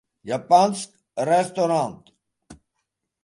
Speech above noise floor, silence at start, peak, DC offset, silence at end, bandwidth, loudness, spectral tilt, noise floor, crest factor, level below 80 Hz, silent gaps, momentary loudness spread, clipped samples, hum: 58 dB; 0.25 s; -4 dBFS; under 0.1%; 0.7 s; 11.5 kHz; -22 LUFS; -5 dB/octave; -79 dBFS; 20 dB; -66 dBFS; none; 13 LU; under 0.1%; none